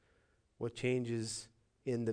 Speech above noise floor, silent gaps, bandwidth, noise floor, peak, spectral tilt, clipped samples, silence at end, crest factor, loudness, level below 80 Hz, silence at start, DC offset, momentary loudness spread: 37 dB; none; 10 kHz; -73 dBFS; -22 dBFS; -5.5 dB/octave; under 0.1%; 0 s; 18 dB; -39 LUFS; -70 dBFS; 0.6 s; under 0.1%; 10 LU